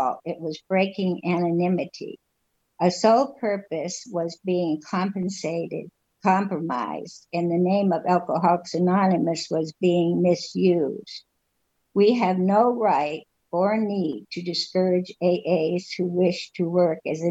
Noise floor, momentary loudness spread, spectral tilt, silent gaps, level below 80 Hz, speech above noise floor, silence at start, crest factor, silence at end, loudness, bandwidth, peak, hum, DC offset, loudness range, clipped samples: -73 dBFS; 10 LU; -6.5 dB/octave; none; -72 dBFS; 50 dB; 0 s; 18 dB; 0 s; -24 LUFS; 8 kHz; -6 dBFS; none; under 0.1%; 4 LU; under 0.1%